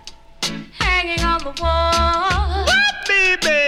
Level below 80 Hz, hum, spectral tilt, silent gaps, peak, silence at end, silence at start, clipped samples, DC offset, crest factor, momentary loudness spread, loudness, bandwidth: -26 dBFS; none; -3 dB/octave; none; -6 dBFS; 0 s; 0.05 s; under 0.1%; under 0.1%; 14 dB; 10 LU; -17 LUFS; 15.5 kHz